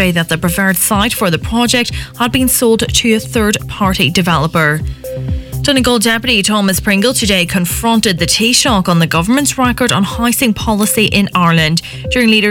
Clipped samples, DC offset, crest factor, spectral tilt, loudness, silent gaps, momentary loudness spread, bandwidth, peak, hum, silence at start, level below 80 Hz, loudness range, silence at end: under 0.1%; under 0.1%; 12 dB; -3.5 dB/octave; -12 LUFS; none; 5 LU; 19 kHz; 0 dBFS; none; 0 s; -30 dBFS; 2 LU; 0 s